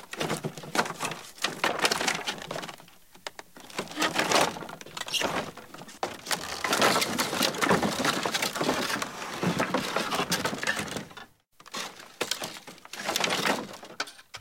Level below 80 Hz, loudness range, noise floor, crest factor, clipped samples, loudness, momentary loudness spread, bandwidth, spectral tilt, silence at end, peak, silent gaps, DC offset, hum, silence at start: -64 dBFS; 5 LU; -54 dBFS; 24 dB; under 0.1%; -28 LUFS; 17 LU; 17 kHz; -2.5 dB/octave; 0 s; -8 dBFS; none; under 0.1%; none; 0 s